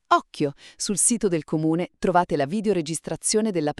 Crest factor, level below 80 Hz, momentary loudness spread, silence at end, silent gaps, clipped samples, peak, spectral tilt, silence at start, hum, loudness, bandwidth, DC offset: 18 dB; -54 dBFS; 9 LU; 0.1 s; none; under 0.1%; -4 dBFS; -4 dB/octave; 0.1 s; none; -23 LUFS; 13.5 kHz; under 0.1%